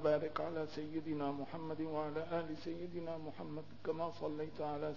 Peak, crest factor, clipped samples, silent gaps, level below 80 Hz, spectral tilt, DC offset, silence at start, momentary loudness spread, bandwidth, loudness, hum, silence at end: -22 dBFS; 18 dB; under 0.1%; none; -68 dBFS; -6 dB/octave; 0.3%; 0 s; 5 LU; 6 kHz; -42 LUFS; none; 0 s